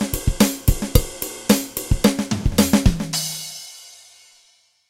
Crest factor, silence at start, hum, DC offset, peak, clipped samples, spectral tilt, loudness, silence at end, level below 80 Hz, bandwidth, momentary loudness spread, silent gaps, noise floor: 20 dB; 0 s; none; under 0.1%; 0 dBFS; under 0.1%; -4.5 dB/octave; -20 LUFS; 1 s; -26 dBFS; 17 kHz; 13 LU; none; -58 dBFS